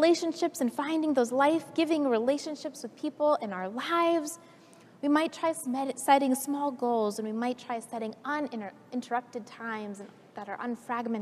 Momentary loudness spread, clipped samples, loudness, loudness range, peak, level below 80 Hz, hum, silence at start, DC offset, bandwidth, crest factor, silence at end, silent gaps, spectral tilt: 14 LU; under 0.1%; -30 LUFS; 7 LU; -10 dBFS; -86 dBFS; none; 0 s; under 0.1%; 15 kHz; 20 dB; 0 s; none; -4 dB/octave